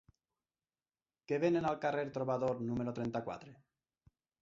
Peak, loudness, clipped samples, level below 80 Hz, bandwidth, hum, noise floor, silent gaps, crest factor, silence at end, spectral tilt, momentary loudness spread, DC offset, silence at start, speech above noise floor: -20 dBFS; -36 LUFS; under 0.1%; -70 dBFS; 7.4 kHz; none; under -90 dBFS; none; 18 dB; 0.85 s; -6.5 dB/octave; 8 LU; under 0.1%; 1.3 s; over 54 dB